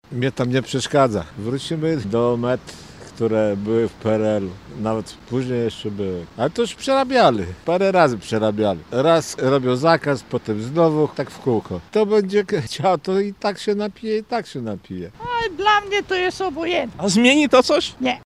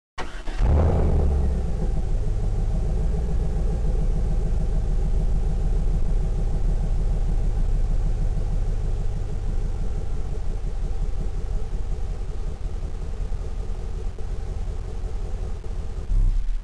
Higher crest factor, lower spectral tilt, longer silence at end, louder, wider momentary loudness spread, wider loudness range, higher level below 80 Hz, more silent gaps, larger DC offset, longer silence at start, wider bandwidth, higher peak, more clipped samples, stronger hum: first, 20 dB vs 8 dB; second, -5.5 dB/octave vs -8 dB/octave; about the same, 0.05 s vs 0 s; first, -20 LUFS vs -28 LUFS; about the same, 11 LU vs 9 LU; second, 5 LU vs 8 LU; second, -52 dBFS vs -24 dBFS; neither; second, under 0.1% vs 0.9%; about the same, 0.1 s vs 0.15 s; first, 13.5 kHz vs 8.2 kHz; first, 0 dBFS vs -14 dBFS; neither; neither